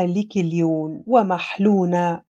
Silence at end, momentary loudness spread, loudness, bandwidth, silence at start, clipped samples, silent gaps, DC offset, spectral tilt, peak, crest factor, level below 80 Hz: 0.2 s; 5 LU; -20 LUFS; 7.6 kHz; 0 s; under 0.1%; none; under 0.1%; -7.5 dB/octave; -4 dBFS; 16 dB; -68 dBFS